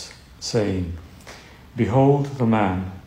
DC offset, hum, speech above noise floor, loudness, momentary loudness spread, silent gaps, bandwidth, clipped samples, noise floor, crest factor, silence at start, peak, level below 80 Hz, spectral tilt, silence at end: under 0.1%; none; 23 dB; -21 LUFS; 22 LU; none; 11.5 kHz; under 0.1%; -43 dBFS; 16 dB; 0 s; -6 dBFS; -46 dBFS; -7 dB/octave; 0.05 s